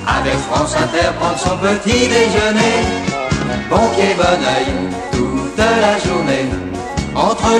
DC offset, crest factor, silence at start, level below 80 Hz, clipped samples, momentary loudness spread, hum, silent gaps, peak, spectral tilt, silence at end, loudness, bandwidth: under 0.1%; 14 dB; 0 s; -32 dBFS; under 0.1%; 6 LU; none; none; 0 dBFS; -4.5 dB/octave; 0 s; -15 LUFS; 12.5 kHz